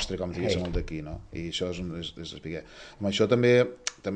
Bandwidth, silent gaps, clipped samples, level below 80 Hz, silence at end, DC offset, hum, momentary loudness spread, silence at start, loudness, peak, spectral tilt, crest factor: 9.8 kHz; none; under 0.1%; -44 dBFS; 0 s; under 0.1%; none; 17 LU; 0 s; -28 LUFS; -8 dBFS; -5 dB/octave; 20 dB